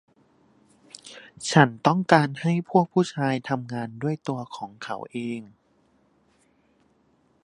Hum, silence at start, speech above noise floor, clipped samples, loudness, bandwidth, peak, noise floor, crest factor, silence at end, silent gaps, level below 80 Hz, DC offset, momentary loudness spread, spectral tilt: none; 1.05 s; 41 dB; under 0.1%; -24 LUFS; 11.5 kHz; 0 dBFS; -65 dBFS; 26 dB; 1.95 s; none; -70 dBFS; under 0.1%; 18 LU; -6 dB/octave